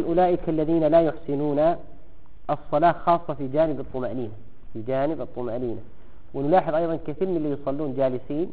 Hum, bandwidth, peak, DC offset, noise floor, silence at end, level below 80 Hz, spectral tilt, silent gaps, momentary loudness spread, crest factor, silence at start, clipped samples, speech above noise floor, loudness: none; 4.7 kHz; -8 dBFS; 2%; -48 dBFS; 0 s; -46 dBFS; -7 dB/octave; none; 13 LU; 16 dB; 0 s; under 0.1%; 24 dB; -24 LUFS